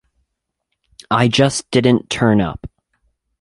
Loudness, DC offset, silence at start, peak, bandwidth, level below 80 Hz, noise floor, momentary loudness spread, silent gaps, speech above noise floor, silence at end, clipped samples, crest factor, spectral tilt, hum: -16 LUFS; under 0.1%; 1.1 s; 0 dBFS; 11.5 kHz; -44 dBFS; -75 dBFS; 7 LU; none; 60 dB; 0.75 s; under 0.1%; 18 dB; -5.5 dB/octave; none